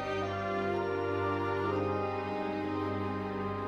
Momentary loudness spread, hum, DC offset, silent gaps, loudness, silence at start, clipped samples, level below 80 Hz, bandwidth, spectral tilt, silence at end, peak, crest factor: 3 LU; none; under 0.1%; none; -33 LUFS; 0 s; under 0.1%; -62 dBFS; 8.2 kHz; -7.5 dB/octave; 0 s; -20 dBFS; 12 dB